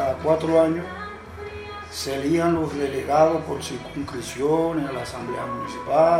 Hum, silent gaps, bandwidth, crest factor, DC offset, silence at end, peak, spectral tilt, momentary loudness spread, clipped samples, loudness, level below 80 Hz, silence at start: none; none; 15.5 kHz; 18 dB; under 0.1%; 0 s; -6 dBFS; -5.5 dB/octave; 15 LU; under 0.1%; -24 LUFS; -48 dBFS; 0 s